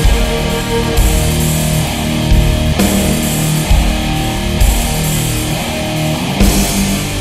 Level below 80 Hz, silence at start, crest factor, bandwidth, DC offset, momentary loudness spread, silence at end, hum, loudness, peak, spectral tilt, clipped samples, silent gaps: -16 dBFS; 0 s; 12 dB; 16.5 kHz; 0.6%; 4 LU; 0 s; none; -14 LUFS; 0 dBFS; -4.5 dB/octave; under 0.1%; none